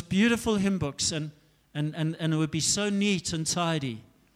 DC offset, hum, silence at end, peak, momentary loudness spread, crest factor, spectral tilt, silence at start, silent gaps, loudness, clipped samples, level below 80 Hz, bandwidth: under 0.1%; none; 0.35 s; -14 dBFS; 11 LU; 14 dB; -4 dB/octave; 0 s; none; -27 LUFS; under 0.1%; -54 dBFS; 15 kHz